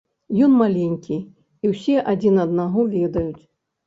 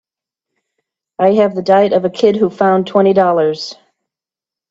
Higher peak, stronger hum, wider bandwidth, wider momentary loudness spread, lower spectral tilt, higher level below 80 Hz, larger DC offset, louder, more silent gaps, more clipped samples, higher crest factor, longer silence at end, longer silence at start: second, -4 dBFS vs 0 dBFS; neither; about the same, 7.6 kHz vs 7.8 kHz; first, 11 LU vs 8 LU; first, -9 dB/octave vs -7 dB/octave; first, -50 dBFS vs -62 dBFS; neither; second, -20 LUFS vs -13 LUFS; neither; neither; about the same, 16 dB vs 14 dB; second, 0.5 s vs 1 s; second, 0.3 s vs 1.2 s